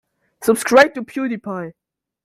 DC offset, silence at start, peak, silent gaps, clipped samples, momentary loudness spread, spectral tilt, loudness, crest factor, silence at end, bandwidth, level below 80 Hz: under 0.1%; 0.4 s; 0 dBFS; none; under 0.1%; 16 LU; -4 dB/octave; -17 LUFS; 18 dB; 0.55 s; 16 kHz; -60 dBFS